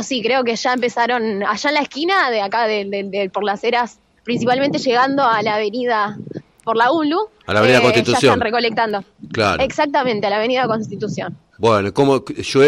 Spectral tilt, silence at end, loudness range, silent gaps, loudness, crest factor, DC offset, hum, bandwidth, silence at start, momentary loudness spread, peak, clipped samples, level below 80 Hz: -4.5 dB/octave; 0 s; 3 LU; none; -17 LUFS; 16 dB; under 0.1%; none; 13.5 kHz; 0 s; 10 LU; -2 dBFS; under 0.1%; -54 dBFS